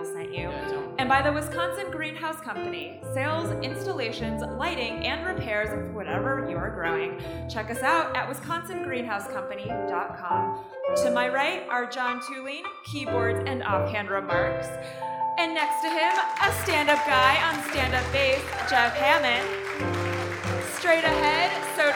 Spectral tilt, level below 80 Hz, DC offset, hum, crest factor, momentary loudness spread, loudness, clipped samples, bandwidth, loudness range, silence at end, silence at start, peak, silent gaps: -4 dB/octave; -48 dBFS; under 0.1%; none; 20 dB; 11 LU; -26 LUFS; under 0.1%; 17.5 kHz; 6 LU; 0 s; 0 s; -6 dBFS; none